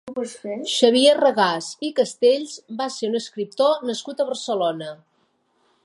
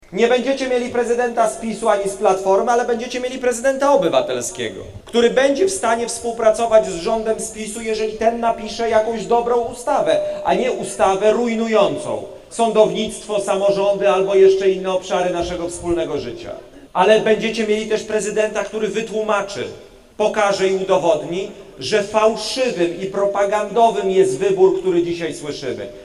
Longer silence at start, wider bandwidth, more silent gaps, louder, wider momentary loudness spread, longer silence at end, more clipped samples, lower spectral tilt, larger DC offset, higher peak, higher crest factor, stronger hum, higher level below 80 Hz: about the same, 0.05 s vs 0.1 s; about the same, 11.5 kHz vs 12.5 kHz; neither; second, -21 LUFS vs -18 LUFS; first, 15 LU vs 10 LU; first, 0.9 s vs 0 s; neither; about the same, -3 dB/octave vs -4 dB/octave; neither; about the same, -2 dBFS vs 0 dBFS; about the same, 20 dB vs 18 dB; neither; second, -78 dBFS vs -48 dBFS